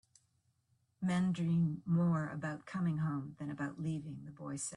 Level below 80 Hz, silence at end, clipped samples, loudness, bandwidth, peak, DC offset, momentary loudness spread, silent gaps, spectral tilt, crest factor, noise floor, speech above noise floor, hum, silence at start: -72 dBFS; 0 s; under 0.1%; -37 LUFS; 11.5 kHz; -24 dBFS; under 0.1%; 11 LU; none; -6.5 dB/octave; 12 dB; -77 dBFS; 41 dB; none; 1 s